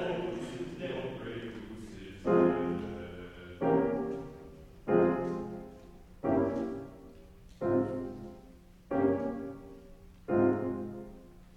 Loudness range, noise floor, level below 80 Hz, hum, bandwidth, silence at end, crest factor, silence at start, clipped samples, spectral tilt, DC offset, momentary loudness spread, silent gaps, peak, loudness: 4 LU; -55 dBFS; -56 dBFS; none; 9.8 kHz; 0 s; 20 dB; 0 s; under 0.1%; -8 dB/octave; under 0.1%; 21 LU; none; -14 dBFS; -33 LUFS